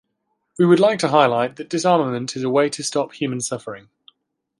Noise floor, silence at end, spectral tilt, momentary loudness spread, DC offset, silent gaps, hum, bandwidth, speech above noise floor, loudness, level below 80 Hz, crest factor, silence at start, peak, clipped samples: -73 dBFS; 0.8 s; -5 dB/octave; 11 LU; under 0.1%; none; none; 11.5 kHz; 54 dB; -19 LUFS; -68 dBFS; 18 dB; 0.6 s; -2 dBFS; under 0.1%